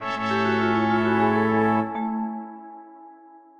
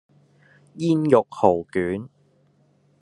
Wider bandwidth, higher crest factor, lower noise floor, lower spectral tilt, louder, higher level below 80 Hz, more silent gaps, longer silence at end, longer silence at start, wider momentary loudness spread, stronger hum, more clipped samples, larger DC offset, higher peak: second, 7.4 kHz vs 11 kHz; second, 14 dB vs 22 dB; second, -49 dBFS vs -61 dBFS; about the same, -7 dB/octave vs -8 dB/octave; about the same, -22 LUFS vs -21 LUFS; first, -60 dBFS vs -68 dBFS; neither; second, 0.2 s vs 0.95 s; second, 0 s vs 0.75 s; first, 19 LU vs 12 LU; neither; neither; neither; second, -10 dBFS vs -2 dBFS